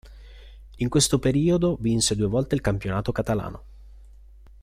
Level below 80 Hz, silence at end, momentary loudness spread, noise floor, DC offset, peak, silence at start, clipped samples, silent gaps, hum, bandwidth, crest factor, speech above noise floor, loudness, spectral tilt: -42 dBFS; 0.5 s; 8 LU; -48 dBFS; under 0.1%; -8 dBFS; 0.05 s; under 0.1%; none; none; 15.5 kHz; 18 dB; 25 dB; -23 LUFS; -5 dB/octave